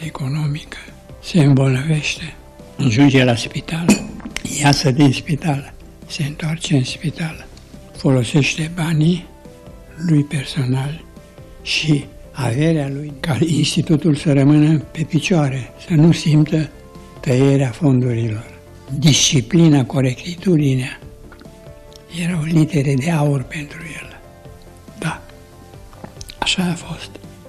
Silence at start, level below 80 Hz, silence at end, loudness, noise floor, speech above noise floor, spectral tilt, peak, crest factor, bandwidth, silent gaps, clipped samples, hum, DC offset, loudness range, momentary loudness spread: 0 s; -42 dBFS; 0 s; -17 LUFS; -40 dBFS; 24 dB; -5.5 dB/octave; -4 dBFS; 14 dB; 13.5 kHz; none; under 0.1%; none; under 0.1%; 5 LU; 18 LU